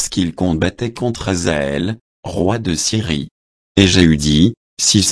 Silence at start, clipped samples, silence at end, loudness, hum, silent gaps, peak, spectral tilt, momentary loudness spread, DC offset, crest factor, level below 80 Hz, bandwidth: 0 s; under 0.1%; 0 s; -16 LUFS; none; 2.01-2.23 s, 3.31-3.75 s, 4.57-4.77 s; 0 dBFS; -4 dB/octave; 10 LU; under 0.1%; 16 dB; -34 dBFS; 11 kHz